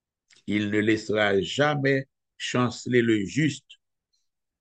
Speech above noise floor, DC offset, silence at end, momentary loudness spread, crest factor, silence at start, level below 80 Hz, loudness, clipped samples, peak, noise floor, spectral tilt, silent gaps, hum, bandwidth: 53 dB; under 0.1%; 0.85 s; 10 LU; 18 dB; 0.45 s; -64 dBFS; -25 LUFS; under 0.1%; -8 dBFS; -77 dBFS; -5.5 dB/octave; none; none; 9 kHz